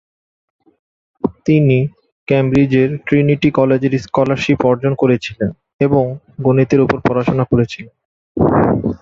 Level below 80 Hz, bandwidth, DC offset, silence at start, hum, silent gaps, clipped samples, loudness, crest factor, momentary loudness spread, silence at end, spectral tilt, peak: -42 dBFS; 7.4 kHz; under 0.1%; 1.25 s; none; 2.12-2.27 s, 5.73-5.79 s, 8.05-8.35 s; under 0.1%; -15 LUFS; 14 dB; 10 LU; 0.05 s; -8 dB/octave; 0 dBFS